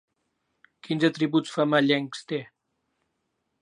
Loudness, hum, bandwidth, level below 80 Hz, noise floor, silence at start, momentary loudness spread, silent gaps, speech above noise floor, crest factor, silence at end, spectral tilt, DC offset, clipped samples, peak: -25 LUFS; none; 10.5 kHz; -80 dBFS; -78 dBFS; 0.85 s; 11 LU; none; 53 dB; 22 dB; 1.15 s; -5.5 dB/octave; under 0.1%; under 0.1%; -6 dBFS